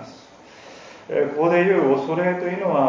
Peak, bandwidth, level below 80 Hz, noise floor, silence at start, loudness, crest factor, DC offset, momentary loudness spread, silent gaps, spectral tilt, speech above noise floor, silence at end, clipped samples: -6 dBFS; 7.6 kHz; -68 dBFS; -45 dBFS; 0 s; -20 LUFS; 16 dB; under 0.1%; 24 LU; none; -7.5 dB/octave; 26 dB; 0 s; under 0.1%